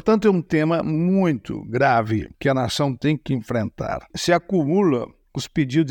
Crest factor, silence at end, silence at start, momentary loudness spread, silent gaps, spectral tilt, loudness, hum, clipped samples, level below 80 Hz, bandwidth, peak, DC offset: 16 dB; 0 s; 0.05 s; 9 LU; none; -6.5 dB/octave; -21 LUFS; none; under 0.1%; -50 dBFS; 18 kHz; -4 dBFS; under 0.1%